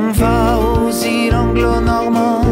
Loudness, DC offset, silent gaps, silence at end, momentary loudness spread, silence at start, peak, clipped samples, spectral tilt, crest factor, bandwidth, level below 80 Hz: -14 LUFS; under 0.1%; none; 0 s; 2 LU; 0 s; -4 dBFS; under 0.1%; -6 dB/octave; 10 dB; 16.5 kHz; -22 dBFS